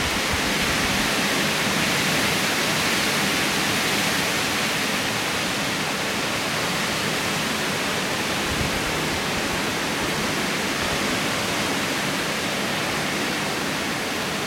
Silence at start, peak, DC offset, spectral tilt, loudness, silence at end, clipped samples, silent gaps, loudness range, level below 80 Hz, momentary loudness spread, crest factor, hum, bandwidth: 0 s; -8 dBFS; under 0.1%; -2.5 dB/octave; -22 LUFS; 0 s; under 0.1%; none; 3 LU; -46 dBFS; 3 LU; 16 dB; none; 16.5 kHz